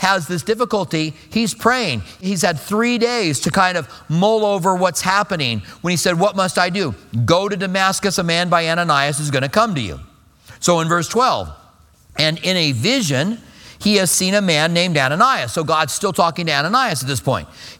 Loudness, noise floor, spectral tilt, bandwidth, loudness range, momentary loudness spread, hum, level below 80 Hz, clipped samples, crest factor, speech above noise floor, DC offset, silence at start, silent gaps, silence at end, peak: -17 LUFS; -49 dBFS; -4 dB/octave; 19 kHz; 3 LU; 7 LU; none; -48 dBFS; under 0.1%; 18 dB; 32 dB; under 0.1%; 0 s; none; 0.05 s; 0 dBFS